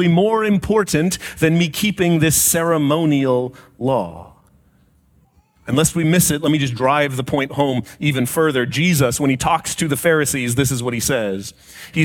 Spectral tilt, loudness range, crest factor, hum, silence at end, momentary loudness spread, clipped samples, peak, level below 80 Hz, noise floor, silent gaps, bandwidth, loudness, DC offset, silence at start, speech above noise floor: -4.5 dB/octave; 4 LU; 16 dB; none; 0 s; 7 LU; under 0.1%; -2 dBFS; -44 dBFS; -56 dBFS; none; 18.5 kHz; -17 LUFS; under 0.1%; 0 s; 38 dB